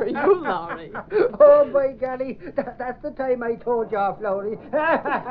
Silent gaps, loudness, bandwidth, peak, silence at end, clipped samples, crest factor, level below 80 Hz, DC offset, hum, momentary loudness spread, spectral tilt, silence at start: none; -21 LUFS; 4.9 kHz; -4 dBFS; 0 s; under 0.1%; 18 dB; -54 dBFS; under 0.1%; none; 15 LU; -4.5 dB/octave; 0 s